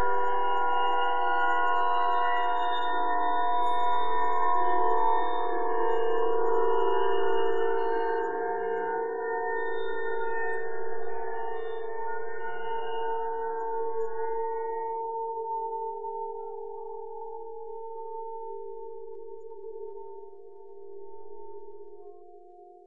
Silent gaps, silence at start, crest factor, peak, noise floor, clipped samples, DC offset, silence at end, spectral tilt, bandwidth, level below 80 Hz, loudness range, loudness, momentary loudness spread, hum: none; 0 s; 14 dB; -12 dBFS; -51 dBFS; under 0.1%; 3%; 0 s; -6 dB/octave; 7.4 kHz; -72 dBFS; 15 LU; -29 LUFS; 18 LU; none